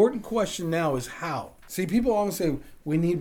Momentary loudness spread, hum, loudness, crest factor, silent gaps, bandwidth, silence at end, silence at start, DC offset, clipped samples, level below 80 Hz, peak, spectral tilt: 9 LU; none; -27 LUFS; 16 dB; none; over 20 kHz; 0 s; 0 s; under 0.1%; under 0.1%; -48 dBFS; -10 dBFS; -6 dB/octave